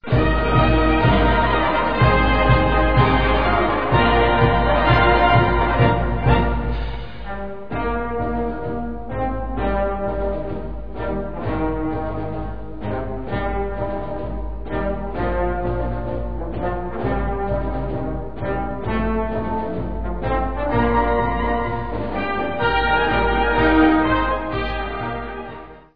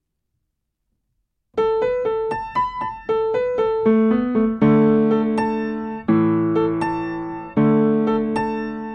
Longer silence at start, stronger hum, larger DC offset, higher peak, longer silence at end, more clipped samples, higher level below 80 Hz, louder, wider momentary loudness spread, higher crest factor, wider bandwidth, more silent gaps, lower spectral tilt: second, 0 s vs 1.55 s; neither; first, 2% vs under 0.1%; about the same, -2 dBFS vs -4 dBFS; about the same, 0 s vs 0 s; neither; first, -26 dBFS vs -50 dBFS; about the same, -20 LUFS vs -20 LUFS; first, 12 LU vs 9 LU; about the same, 18 dB vs 16 dB; second, 5.2 kHz vs 9 kHz; neither; about the same, -9.5 dB/octave vs -9 dB/octave